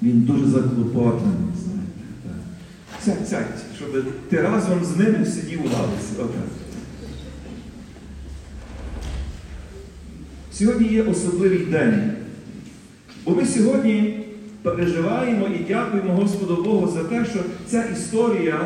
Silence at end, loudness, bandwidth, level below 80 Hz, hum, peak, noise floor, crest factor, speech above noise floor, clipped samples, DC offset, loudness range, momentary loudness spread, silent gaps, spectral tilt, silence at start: 0 s; -21 LUFS; 11.5 kHz; -42 dBFS; none; -6 dBFS; -43 dBFS; 16 dB; 23 dB; under 0.1%; under 0.1%; 12 LU; 20 LU; none; -6.5 dB/octave; 0 s